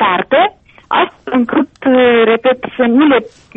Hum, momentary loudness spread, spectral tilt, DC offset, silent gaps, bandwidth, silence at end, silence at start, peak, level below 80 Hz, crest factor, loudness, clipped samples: none; 6 LU; -7 dB/octave; under 0.1%; none; 4 kHz; 0.3 s; 0 s; -2 dBFS; -52 dBFS; 10 dB; -12 LUFS; under 0.1%